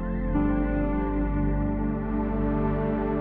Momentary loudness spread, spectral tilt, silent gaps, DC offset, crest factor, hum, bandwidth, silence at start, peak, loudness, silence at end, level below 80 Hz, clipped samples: 3 LU; -9.5 dB/octave; none; under 0.1%; 12 dB; 50 Hz at -30 dBFS; 3.7 kHz; 0 s; -14 dBFS; -27 LUFS; 0 s; -30 dBFS; under 0.1%